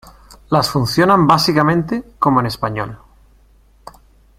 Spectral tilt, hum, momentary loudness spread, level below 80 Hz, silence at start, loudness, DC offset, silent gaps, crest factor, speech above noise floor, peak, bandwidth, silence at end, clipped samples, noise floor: -5.5 dB/octave; none; 11 LU; -44 dBFS; 0.3 s; -15 LUFS; under 0.1%; none; 16 dB; 35 dB; 0 dBFS; 16 kHz; 1.45 s; under 0.1%; -50 dBFS